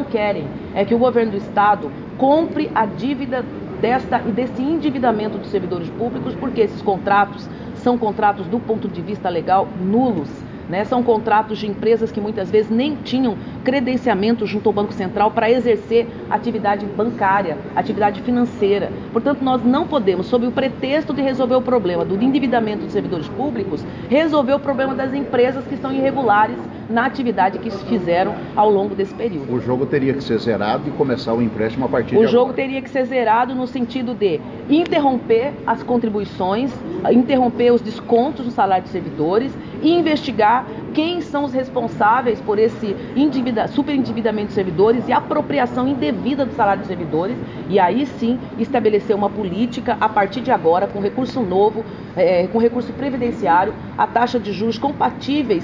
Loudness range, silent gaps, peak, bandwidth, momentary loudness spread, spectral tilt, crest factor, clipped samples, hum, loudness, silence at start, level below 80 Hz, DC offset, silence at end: 2 LU; none; -4 dBFS; 7.4 kHz; 7 LU; -7.5 dB/octave; 14 dB; under 0.1%; none; -19 LUFS; 0 s; -48 dBFS; under 0.1%; 0 s